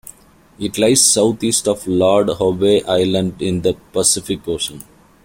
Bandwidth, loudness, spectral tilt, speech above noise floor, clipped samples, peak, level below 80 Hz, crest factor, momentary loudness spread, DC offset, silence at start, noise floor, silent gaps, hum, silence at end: 16.5 kHz; -16 LUFS; -3.5 dB/octave; 26 dB; under 0.1%; 0 dBFS; -48 dBFS; 16 dB; 11 LU; under 0.1%; 0.6 s; -42 dBFS; none; none; 0.4 s